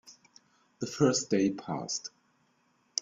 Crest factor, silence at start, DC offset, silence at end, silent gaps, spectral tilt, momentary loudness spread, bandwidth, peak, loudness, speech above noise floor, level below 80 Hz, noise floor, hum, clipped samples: 24 dB; 0.05 s; under 0.1%; 0 s; none; -4 dB/octave; 13 LU; 7.8 kHz; -8 dBFS; -31 LUFS; 41 dB; -72 dBFS; -71 dBFS; none; under 0.1%